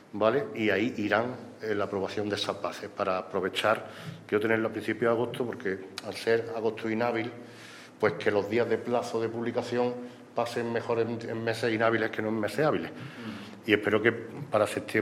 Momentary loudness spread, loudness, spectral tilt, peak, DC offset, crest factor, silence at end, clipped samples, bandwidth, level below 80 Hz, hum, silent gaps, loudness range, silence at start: 12 LU; -29 LUFS; -5.5 dB/octave; -6 dBFS; under 0.1%; 22 dB; 0 s; under 0.1%; 15.5 kHz; -74 dBFS; none; none; 2 LU; 0.15 s